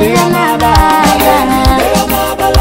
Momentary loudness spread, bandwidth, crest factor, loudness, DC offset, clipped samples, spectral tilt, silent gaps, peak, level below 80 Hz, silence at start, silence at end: 3 LU; 16.5 kHz; 8 dB; -9 LUFS; under 0.1%; under 0.1%; -4.5 dB/octave; none; 0 dBFS; -18 dBFS; 0 s; 0 s